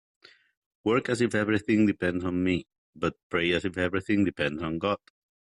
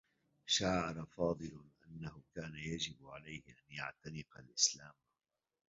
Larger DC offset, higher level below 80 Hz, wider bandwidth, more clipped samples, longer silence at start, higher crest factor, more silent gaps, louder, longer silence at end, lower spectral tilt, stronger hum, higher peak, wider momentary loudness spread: neither; about the same, -60 dBFS vs -64 dBFS; first, 11.5 kHz vs 7.6 kHz; neither; first, 0.85 s vs 0.45 s; second, 16 dB vs 26 dB; first, 2.78-2.93 s, 3.23-3.30 s vs none; first, -27 LUFS vs -38 LUFS; second, 0.45 s vs 0.75 s; first, -6 dB/octave vs -3 dB/octave; neither; first, -12 dBFS vs -16 dBFS; second, 8 LU vs 18 LU